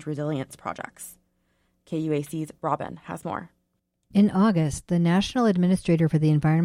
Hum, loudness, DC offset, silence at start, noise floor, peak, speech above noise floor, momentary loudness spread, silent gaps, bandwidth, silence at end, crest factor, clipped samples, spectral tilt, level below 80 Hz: none; -24 LUFS; under 0.1%; 0 s; -75 dBFS; -10 dBFS; 51 dB; 14 LU; none; 14.5 kHz; 0 s; 14 dB; under 0.1%; -7 dB/octave; -52 dBFS